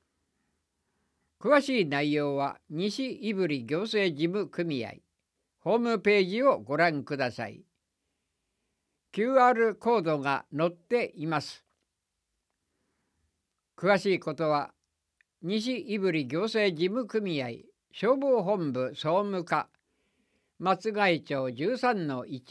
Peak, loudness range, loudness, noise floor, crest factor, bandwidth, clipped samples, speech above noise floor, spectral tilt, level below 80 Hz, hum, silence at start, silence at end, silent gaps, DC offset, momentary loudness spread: -10 dBFS; 4 LU; -28 LUFS; -83 dBFS; 20 dB; 11 kHz; under 0.1%; 55 dB; -6 dB/octave; -78 dBFS; none; 1.45 s; 0 s; none; under 0.1%; 9 LU